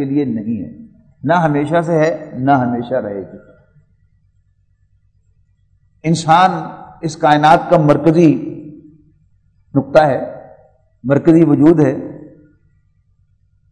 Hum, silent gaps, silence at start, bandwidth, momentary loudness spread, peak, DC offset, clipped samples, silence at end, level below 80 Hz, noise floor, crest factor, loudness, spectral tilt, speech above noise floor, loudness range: 50 Hz at -40 dBFS; none; 0 s; 9.4 kHz; 18 LU; 0 dBFS; under 0.1%; 0.2%; 1.45 s; -52 dBFS; -57 dBFS; 16 dB; -14 LUFS; -7 dB/octave; 44 dB; 8 LU